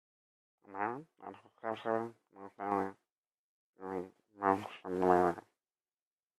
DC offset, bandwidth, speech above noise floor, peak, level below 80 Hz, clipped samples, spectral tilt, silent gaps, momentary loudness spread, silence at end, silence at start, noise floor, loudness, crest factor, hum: under 0.1%; 13 kHz; over 55 dB; -12 dBFS; -80 dBFS; under 0.1%; -7 dB/octave; 3.12-3.23 s, 3.34-3.73 s; 21 LU; 1 s; 0.7 s; under -90 dBFS; -36 LUFS; 26 dB; none